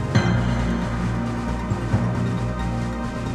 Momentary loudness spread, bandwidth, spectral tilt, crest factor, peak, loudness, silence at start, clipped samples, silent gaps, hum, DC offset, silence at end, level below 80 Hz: 6 LU; 10.5 kHz; -7 dB/octave; 16 dB; -6 dBFS; -24 LUFS; 0 s; under 0.1%; none; 60 Hz at -35 dBFS; under 0.1%; 0 s; -32 dBFS